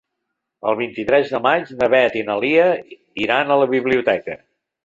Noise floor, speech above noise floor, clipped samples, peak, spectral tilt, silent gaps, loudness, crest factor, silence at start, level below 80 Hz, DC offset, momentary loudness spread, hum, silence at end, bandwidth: -78 dBFS; 60 dB; under 0.1%; -2 dBFS; -6.5 dB/octave; none; -18 LUFS; 16 dB; 0.65 s; -58 dBFS; under 0.1%; 10 LU; none; 0.5 s; 7.6 kHz